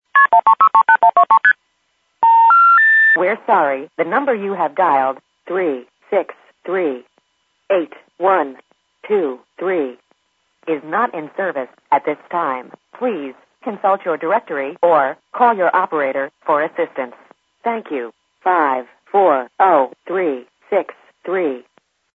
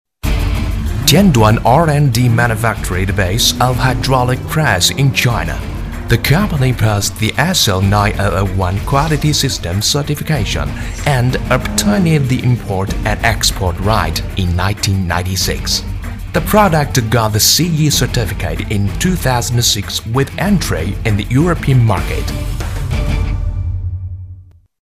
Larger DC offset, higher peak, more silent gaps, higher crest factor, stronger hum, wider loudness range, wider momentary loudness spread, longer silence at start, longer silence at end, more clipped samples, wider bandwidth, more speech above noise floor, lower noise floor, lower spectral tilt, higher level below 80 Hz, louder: neither; about the same, 0 dBFS vs 0 dBFS; neither; about the same, 16 dB vs 14 dB; neither; first, 10 LU vs 3 LU; first, 16 LU vs 9 LU; about the same, 0.15 s vs 0.25 s; first, 0.55 s vs 0.4 s; neither; second, 4.3 kHz vs 16.5 kHz; first, 48 dB vs 23 dB; first, -66 dBFS vs -36 dBFS; first, -7 dB/octave vs -4.5 dB/octave; second, -78 dBFS vs -24 dBFS; about the same, -16 LUFS vs -14 LUFS